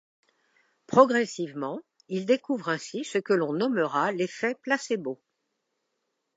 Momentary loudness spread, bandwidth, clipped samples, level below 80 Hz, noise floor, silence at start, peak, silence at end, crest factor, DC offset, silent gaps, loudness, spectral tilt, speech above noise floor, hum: 14 LU; 8 kHz; under 0.1%; -78 dBFS; -79 dBFS; 0.9 s; -4 dBFS; 1.2 s; 24 dB; under 0.1%; none; -27 LUFS; -5 dB/octave; 53 dB; none